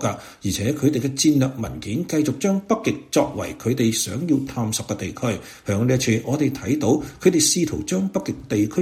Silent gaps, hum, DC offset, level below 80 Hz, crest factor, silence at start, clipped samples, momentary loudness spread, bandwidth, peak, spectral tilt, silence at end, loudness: none; none; under 0.1%; -50 dBFS; 18 dB; 0 s; under 0.1%; 9 LU; 16.5 kHz; -2 dBFS; -5 dB/octave; 0 s; -22 LUFS